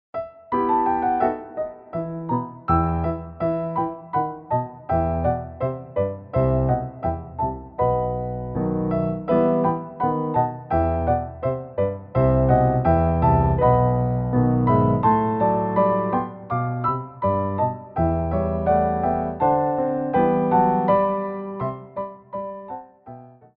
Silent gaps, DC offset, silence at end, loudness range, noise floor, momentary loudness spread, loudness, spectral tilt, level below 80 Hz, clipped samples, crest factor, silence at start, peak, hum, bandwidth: none; under 0.1%; 0.25 s; 5 LU; -43 dBFS; 11 LU; -22 LUFS; -13 dB/octave; -36 dBFS; under 0.1%; 16 dB; 0.15 s; -4 dBFS; none; 4.3 kHz